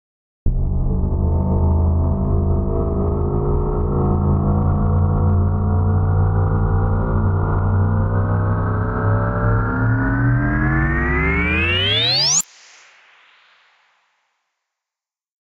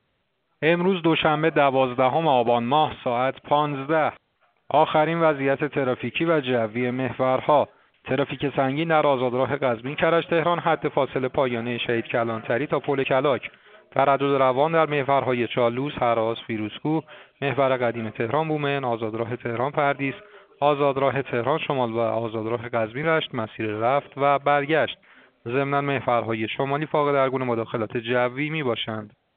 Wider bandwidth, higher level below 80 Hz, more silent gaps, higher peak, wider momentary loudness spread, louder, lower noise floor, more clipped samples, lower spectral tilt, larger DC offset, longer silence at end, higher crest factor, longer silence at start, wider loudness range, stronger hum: first, 12.5 kHz vs 4.6 kHz; first, -24 dBFS vs -62 dBFS; neither; second, -6 dBFS vs -2 dBFS; second, 5 LU vs 8 LU; first, -18 LUFS vs -23 LUFS; first, -89 dBFS vs -72 dBFS; neither; about the same, -5 dB/octave vs -4 dB/octave; neither; first, 3 s vs 0.3 s; second, 12 dB vs 20 dB; second, 0.45 s vs 0.6 s; about the same, 3 LU vs 3 LU; neither